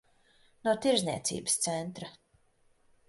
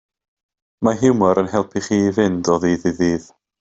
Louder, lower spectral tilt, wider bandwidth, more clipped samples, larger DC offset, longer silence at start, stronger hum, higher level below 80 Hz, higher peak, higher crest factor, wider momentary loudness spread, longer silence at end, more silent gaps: second, -30 LUFS vs -18 LUFS; second, -3 dB/octave vs -6 dB/octave; first, 12 kHz vs 8 kHz; neither; neither; second, 0.65 s vs 0.8 s; neither; second, -68 dBFS vs -52 dBFS; second, -12 dBFS vs -2 dBFS; first, 22 dB vs 16 dB; first, 15 LU vs 6 LU; first, 0.95 s vs 0.4 s; neither